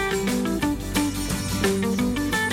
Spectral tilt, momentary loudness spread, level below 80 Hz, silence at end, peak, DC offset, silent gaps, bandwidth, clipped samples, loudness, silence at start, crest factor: -4.5 dB/octave; 3 LU; -38 dBFS; 0 s; -8 dBFS; under 0.1%; none; 16.5 kHz; under 0.1%; -24 LUFS; 0 s; 16 dB